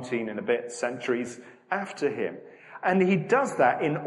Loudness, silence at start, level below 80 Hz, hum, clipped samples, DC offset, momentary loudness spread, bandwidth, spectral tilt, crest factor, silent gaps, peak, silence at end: -27 LUFS; 0 s; -74 dBFS; none; under 0.1%; under 0.1%; 13 LU; 11.5 kHz; -6 dB/octave; 18 dB; none; -8 dBFS; 0 s